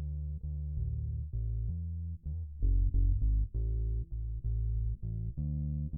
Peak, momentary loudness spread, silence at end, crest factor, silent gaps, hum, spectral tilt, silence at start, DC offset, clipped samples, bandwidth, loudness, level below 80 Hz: -20 dBFS; 8 LU; 0 s; 12 dB; none; none; -14.5 dB/octave; 0 s; under 0.1%; under 0.1%; 0.7 kHz; -36 LUFS; -34 dBFS